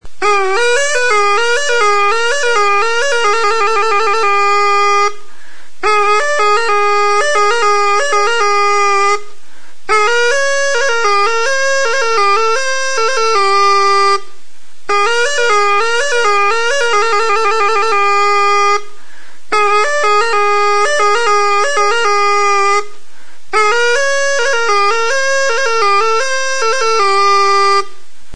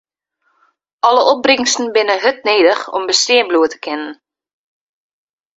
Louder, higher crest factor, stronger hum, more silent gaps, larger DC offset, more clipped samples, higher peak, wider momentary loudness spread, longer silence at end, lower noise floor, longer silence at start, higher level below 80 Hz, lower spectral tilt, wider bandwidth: about the same, -12 LUFS vs -13 LUFS; about the same, 12 dB vs 16 dB; neither; neither; first, 10% vs under 0.1%; neither; about the same, 0 dBFS vs 0 dBFS; second, 3 LU vs 10 LU; second, 0.45 s vs 1.45 s; second, -47 dBFS vs -66 dBFS; second, 0 s vs 1.05 s; first, -52 dBFS vs -62 dBFS; about the same, -0.5 dB/octave vs -0.5 dB/octave; first, 10.5 kHz vs 8 kHz